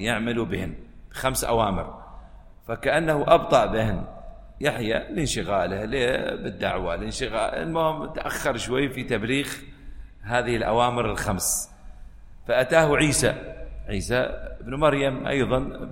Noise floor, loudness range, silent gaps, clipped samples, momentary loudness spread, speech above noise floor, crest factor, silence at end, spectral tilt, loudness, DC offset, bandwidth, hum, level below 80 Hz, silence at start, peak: -45 dBFS; 4 LU; none; under 0.1%; 15 LU; 21 dB; 22 dB; 0 s; -4.5 dB/octave; -24 LUFS; under 0.1%; 16.5 kHz; none; -40 dBFS; 0 s; -2 dBFS